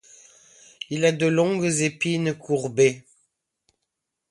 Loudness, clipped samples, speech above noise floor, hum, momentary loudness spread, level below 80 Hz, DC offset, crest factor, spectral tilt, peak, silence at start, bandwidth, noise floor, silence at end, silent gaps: -22 LUFS; under 0.1%; 59 dB; none; 10 LU; -68 dBFS; under 0.1%; 18 dB; -5 dB/octave; -6 dBFS; 0.9 s; 11.5 kHz; -81 dBFS; 1.3 s; none